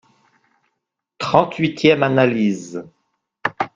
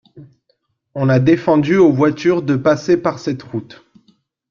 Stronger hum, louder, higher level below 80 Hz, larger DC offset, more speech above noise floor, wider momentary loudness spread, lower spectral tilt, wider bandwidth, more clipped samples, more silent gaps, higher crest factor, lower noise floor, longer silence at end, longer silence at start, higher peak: neither; second, -18 LUFS vs -15 LUFS; about the same, -58 dBFS vs -54 dBFS; neither; first, 61 dB vs 51 dB; about the same, 13 LU vs 13 LU; second, -6 dB/octave vs -7.5 dB/octave; first, 9.4 kHz vs 7.2 kHz; neither; neither; about the same, 20 dB vs 16 dB; first, -78 dBFS vs -66 dBFS; second, 0.1 s vs 0.85 s; first, 1.2 s vs 0.15 s; about the same, 0 dBFS vs -2 dBFS